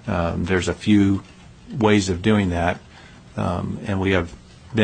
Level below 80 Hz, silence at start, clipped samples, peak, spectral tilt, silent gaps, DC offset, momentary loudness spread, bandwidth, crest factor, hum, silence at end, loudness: -42 dBFS; 0.05 s; under 0.1%; -2 dBFS; -6 dB/octave; none; under 0.1%; 10 LU; 9.4 kHz; 18 dB; none; 0 s; -21 LUFS